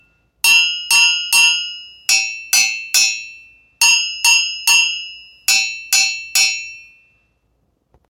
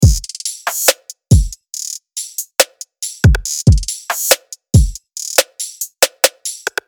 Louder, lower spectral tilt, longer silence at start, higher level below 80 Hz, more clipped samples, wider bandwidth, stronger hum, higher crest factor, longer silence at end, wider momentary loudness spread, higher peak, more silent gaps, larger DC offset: first, -13 LUFS vs -16 LUFS; second, 5 dB/octave vs -3.5 dB/octave; first, 0.45 s vs 0 s; second, -64 dBFS vs -22 dBFS; second, under 0.1% vs 0.3%; about the same, 19 kHz vs over 20 kHz; neither; about the same, 16 dB vs 16 dB; first, 1.25 s vs 0.2 s; first, 14 LU vs 11 LU; about the same, 0 dBFS vs 0 dBFS; neither; neither